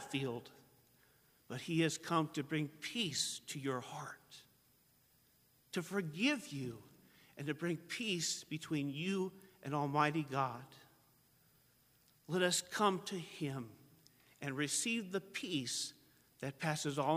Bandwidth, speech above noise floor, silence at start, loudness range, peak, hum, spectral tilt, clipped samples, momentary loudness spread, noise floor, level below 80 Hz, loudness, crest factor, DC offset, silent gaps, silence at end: 15.5 kHz; 33 dB; 0 s; 4 LU; -18 dBFS; none; -4 dB/octave; under 0.1%; 14 LU; -72 dBFS; -80 dBFS; -39 LUFS; 24 dB; under 0.1%; none; 0 s